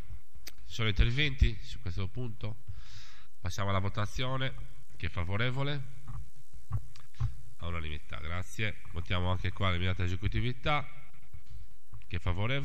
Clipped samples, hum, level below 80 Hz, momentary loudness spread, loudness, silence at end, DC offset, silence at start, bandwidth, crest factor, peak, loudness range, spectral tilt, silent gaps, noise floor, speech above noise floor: under 0.1%; none; -40 dBFS; 20 LU; -35 LUFS; 0 s; 3%; 0 s; 14.5 kHz; 22 dB; -12 dBFS; 4 LU; -5.5 dB/octave; none; -54 dBFS; 21 dB